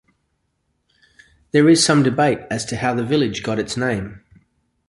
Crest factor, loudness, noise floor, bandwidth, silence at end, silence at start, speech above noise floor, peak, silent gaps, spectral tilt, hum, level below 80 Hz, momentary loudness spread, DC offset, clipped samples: 18 dB; -18 LUFS; -70 dBFS; 11.5 kHz; 0.7 s; 1.55 s; 52 dB; -2 dBFS; none; -4.5 dB/octave; none; -50 dBFS; 11 LU; under 0.1%; under 0.1%